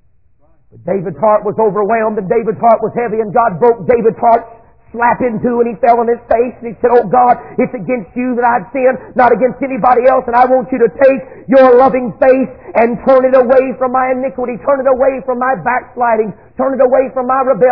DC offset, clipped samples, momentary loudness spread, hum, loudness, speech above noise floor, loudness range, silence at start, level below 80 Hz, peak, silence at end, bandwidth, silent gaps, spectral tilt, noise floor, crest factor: 0.4%; 0.3%; 8 LU; none; -12 LUFS; 42 dB; 3 LU; 0.85 s; -46 dBFS; 0 dBFS; 0 s; 5.2 kHz; none; -10 dB/octave; -53 dBFS; 12 dB